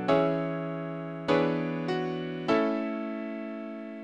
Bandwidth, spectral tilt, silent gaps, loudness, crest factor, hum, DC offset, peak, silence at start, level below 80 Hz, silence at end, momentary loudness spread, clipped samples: 9.2 kHz; -7.5 dB/octave; none; -30 LUFS; 20 dB; none; under 0.1%; -10 dBFS; 0 s; -66 dBFS; 0 s; 11 LU; under 0.1%